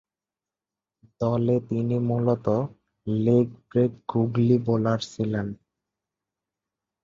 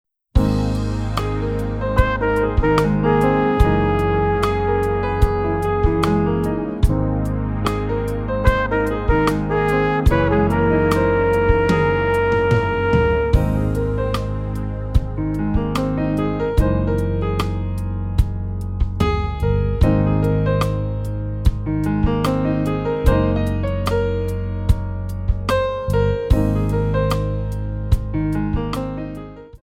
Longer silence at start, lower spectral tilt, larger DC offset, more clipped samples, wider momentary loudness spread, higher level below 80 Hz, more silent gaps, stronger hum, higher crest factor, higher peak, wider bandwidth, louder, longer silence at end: first, 1.2 s vs 0.35 s; about the same, -8.5 dB/octave vs -8 dB/octave; neither; neither; about the same, 9 LU vs 7 LU; second, -58 dBFS vs -24 dBFS; neither; neither; about the same, 18 dB vs 18 dB; second, -8 dBFS vs 0 dBFS; second, 7.6 kHz vs 15.5 kHz; second, -25 LUFS vs -20 LUFS; first, 1.5 s vs 0.05 s